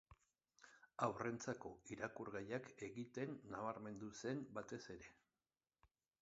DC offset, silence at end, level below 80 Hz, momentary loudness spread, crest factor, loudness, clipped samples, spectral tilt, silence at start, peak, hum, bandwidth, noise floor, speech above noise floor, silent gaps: under 0.1%; 0.35 s; -78 dBFS; 14 LU; 26 dB; -49 LUFS; under 0.1%; -5.5 dB/octave; 0.1 s; -26 dBFS; none; 7.6 kHz; under -90 dBFS; over 41 dB; none